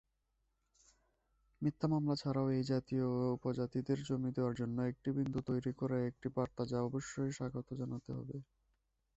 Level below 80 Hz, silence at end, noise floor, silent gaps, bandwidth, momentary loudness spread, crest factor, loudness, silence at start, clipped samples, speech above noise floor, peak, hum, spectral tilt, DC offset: -66 dBFS; 0.75 s; -82 dBFS; none; 8.2 kHz; 8 LU; 18 dB; -38 LUFS; 1.6 s; under 0.1%; 45 dB; -22 dBFS; none; -7.5 dB/octave; under 0.1%